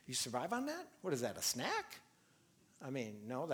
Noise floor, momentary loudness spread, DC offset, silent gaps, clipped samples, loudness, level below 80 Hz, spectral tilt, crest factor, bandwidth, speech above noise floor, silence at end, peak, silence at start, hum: -71 dBFS; 12 LU; under 0.1%; none; under 0.1%; -41 LUFS; -82 dBFS; -3 dB/octave; 18 dB; over 20 kHz; 30 dB; 0 s; -24 dBFS; 0.05 s; none